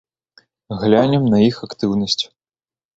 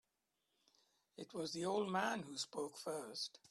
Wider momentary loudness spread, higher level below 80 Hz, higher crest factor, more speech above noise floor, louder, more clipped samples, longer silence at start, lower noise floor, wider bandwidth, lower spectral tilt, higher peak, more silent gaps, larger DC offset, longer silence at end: about the same, 10 LU vs 11 LU; first, -52 dBFS vs -86 dBFS; about the same, 18 dB vs 20 dB; first, over 74 dB vs 44 dB; first, -17 LUFS vs -43 LUFS; neither; second, 0.7 s vs 1.2 s; about the same, under -90 dBFS vs -87 dBFS; second, 7.8 kHz vs 13.5 kHz; first, -6.5 dB/octave vs -3.5 dB/octave; first, 0 dBFS vs -24 dBFS; neither; neither; first, 0.7 s vs 0.05 s